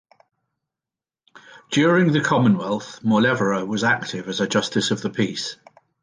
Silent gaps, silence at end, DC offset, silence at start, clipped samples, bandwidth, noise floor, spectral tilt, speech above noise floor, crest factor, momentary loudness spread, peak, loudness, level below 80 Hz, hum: none; 0.5 s; under 0.1%; 1.35 s; under 0.1%; 10 kHz; -90 dBFS; -5 dB/octave; 69 dB; 18 dB; 8 LU; -4 dBFS; -21 LUFS; -64 dBFS; none